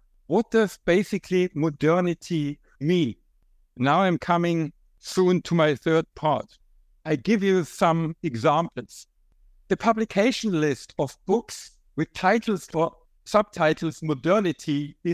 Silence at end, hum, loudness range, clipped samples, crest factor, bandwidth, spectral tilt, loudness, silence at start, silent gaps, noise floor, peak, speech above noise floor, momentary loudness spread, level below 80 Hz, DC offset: 0 s; none; 2 LU; under 0.1%; 18 dB; 15 kHz; -6 dB/octave; -24 LUFS; 0.3 s; none; -61 dBFS; -6 dBFS; 38 dB; 9 LU; -58 dBFS; under 0.1%